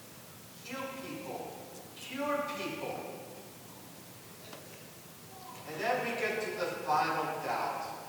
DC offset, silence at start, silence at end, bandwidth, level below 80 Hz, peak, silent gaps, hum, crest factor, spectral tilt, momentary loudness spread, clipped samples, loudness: under 0.1%; 0 s; 0 s; over 20 kHz; -78 dBFS; -18 dBFS; none; none; 20 dB; -3.5 dB/octave; 17 LU; under 0.1%; -36 LUFS